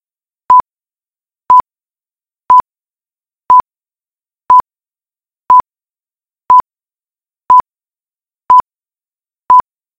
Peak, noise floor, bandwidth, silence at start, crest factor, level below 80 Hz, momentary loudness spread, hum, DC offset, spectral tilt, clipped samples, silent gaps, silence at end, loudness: 0 dBFS; under -90 dBFS; 7.4 kHz; 0.5 s; 14 dB; -52 dBFS; 0 LU; none; under 0.1%; -4.5 dB/octave; 0.5%; none; 0.4 s; -9 LUFS